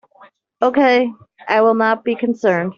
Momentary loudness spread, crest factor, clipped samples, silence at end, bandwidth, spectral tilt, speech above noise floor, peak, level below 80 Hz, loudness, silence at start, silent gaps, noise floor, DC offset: 7 LU; 14 dB; under 0.1%; 0.05 s; 7.2 kHz; -3.5 dB/octave; 33 dB; -2 dBFS; -64 dBFS; -16 LUFS; 0.6 s; none; -49 dBFS; under 0.1%